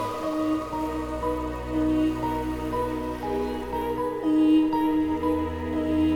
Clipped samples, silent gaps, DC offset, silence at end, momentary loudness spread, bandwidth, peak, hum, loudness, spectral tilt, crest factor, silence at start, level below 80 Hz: under 0.1%; none; under 0.1%; 0 s; 8 LU; 16 kHz; -12 dBFS; none; -26 LUFS; -7 dB/octave; 14 dB; 0 s; -40 dBFS